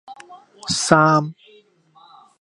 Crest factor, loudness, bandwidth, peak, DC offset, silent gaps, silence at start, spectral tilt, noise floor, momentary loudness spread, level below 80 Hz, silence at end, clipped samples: 22 dB; -17 LUFS; 11.5 kHz; 0 dBFS; under 0.1%; none; 0.1 s; -4.5 dB/octave; -53 dBFS; 18 LU; -58 dBFS; 1.1 s; under 0.1%